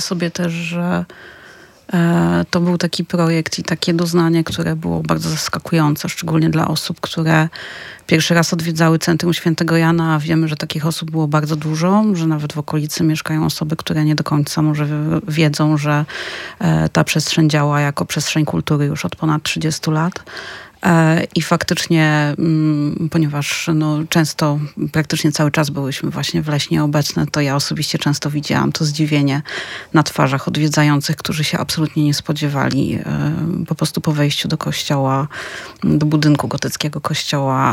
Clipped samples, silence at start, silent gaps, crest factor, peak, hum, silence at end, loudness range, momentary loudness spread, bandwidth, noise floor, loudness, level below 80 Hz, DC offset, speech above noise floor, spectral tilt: under 0.1%; 0 s; none; 16 dB; 0 dBFS; none; 0 s; 2 LU; 6 LU; 16.5 kHz; -42 dBFS; -17 LUFS; -50 dBFS; under 0.1%; 26 dB; -5.5 dB/octave